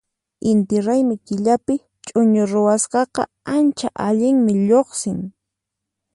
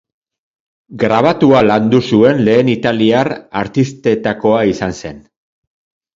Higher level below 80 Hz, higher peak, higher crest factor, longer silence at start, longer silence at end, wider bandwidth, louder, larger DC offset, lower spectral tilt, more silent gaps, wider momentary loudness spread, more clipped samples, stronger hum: second, -58 dBFS vs -46 dBFS; second, -4 dBFS vs 0 dBFS; about the same, 14 dB vs 14 dB; second, 0.45 s vs 0.9 s; about the same, 0.85 s vs 0.95 s; first, 11.5 kHz vs 7.6 kHz; second, -18 LUFS vs -13 LUFS; neither; about the same, -6 dB/octave vs -7 dB/octave; neither; about the same, 9 LU vs 10 LU; neither; neither